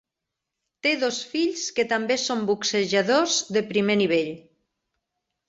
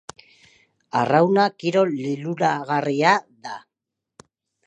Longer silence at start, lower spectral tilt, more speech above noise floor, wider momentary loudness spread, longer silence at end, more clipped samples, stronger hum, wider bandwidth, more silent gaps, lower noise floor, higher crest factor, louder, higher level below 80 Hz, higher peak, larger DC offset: about the same, 0.85 s vs 0.95 s; second, -3 dB/octave vs -6 dB/octave; about the same, 61 dB vs 64 dB; second, 5 LU vs 18 LU; about the same, 1.1 s vs 1.1 s; neither; neither; second, 8 kHz vs 9.8 kHz; neither; about the same, -85 dBFS vs -84 dBFS; about the same, 18 dB vs 20 dB; about the same, -23 LUFS vs -21 LUFS; about the same, -68 dBFS vs -72 dBFS; second, -8 dBFS vs -2 dBFS; neither